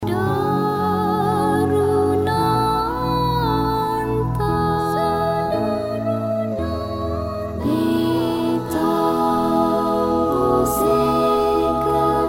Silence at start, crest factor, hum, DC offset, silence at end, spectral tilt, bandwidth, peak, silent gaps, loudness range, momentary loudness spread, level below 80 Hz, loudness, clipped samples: 0 s; 14 dB; none; under 0.1%; 0 s; -6.5 dB/octave; 16.5 kHz; -6 dBFS; none; 4 LU; 5 LU; -38 dBFS; -20 LUFS; under 0.1%